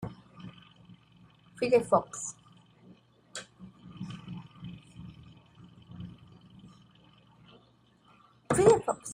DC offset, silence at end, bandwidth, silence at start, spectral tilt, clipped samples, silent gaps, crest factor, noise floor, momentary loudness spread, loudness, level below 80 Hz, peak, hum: under 0.1%; 0 s; 14.5 kHz; 0 s; -5 dB/octave; under 0.1%; none; 24 dB; -64 dBFS; 26 LU; -28 LUFS; -62 dBFS; -8 dBFS; none